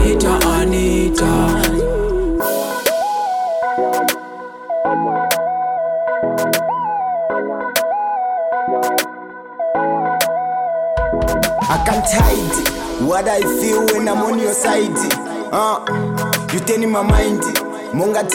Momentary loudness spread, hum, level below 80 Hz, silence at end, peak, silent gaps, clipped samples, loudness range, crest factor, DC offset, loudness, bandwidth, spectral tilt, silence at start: 5 LU; none; -28 dBFS; 0 s; -4 dBFS; none; under 0.1%; 3 LU; 14 dB; under 0.1%; -17 LUFS; 17.5 kHz; -4.5 dB/octave; 0 s